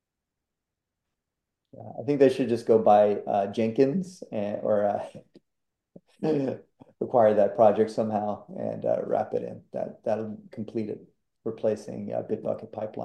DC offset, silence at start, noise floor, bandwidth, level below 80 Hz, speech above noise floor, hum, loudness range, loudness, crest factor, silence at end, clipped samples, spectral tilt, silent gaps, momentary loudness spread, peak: under 0.1%; 1.8 s; -86 dBFS; 10 kHz; -74 dBFS; 60 dB; none; 8 LU; -26 LUFS; 20 dB; 0 s; under 0.1%; -7.5 dB/octave; none; 16 LU; -8 dBFS